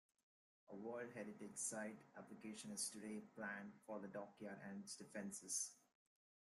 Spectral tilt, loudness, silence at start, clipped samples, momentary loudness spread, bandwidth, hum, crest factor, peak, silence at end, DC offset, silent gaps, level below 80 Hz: -2.5 dB/octave; -51 LUFS; 0.7 s; under 0.1%; 9 LU; 13.5 kHz; none; 20 dB; -32 dBFS; 0.65 s; under 0.1%; none; under -90 dBFS